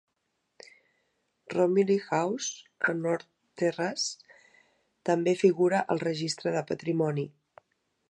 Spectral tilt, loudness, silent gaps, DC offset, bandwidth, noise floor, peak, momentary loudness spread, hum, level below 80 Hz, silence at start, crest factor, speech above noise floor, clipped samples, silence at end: -5 dB/octave; -28 LUFS; none; under 0.1%; 11 kHz; -79 dBFS; -10 dBFS; 11 LU; none; -76 dBFS; 1.5 s; 20 dB; 51 dB; under 0.1%; 0.8 s